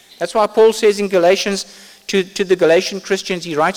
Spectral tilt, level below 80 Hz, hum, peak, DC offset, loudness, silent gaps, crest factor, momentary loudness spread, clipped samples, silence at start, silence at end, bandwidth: -4 dB/octave; -56 dBFS; none; -2 dBFS; under 0.1%; -16 LUFS; none; 12 dB; 9 LU; under 0.1%; 0.2 s; 0 s; 16.5 kHz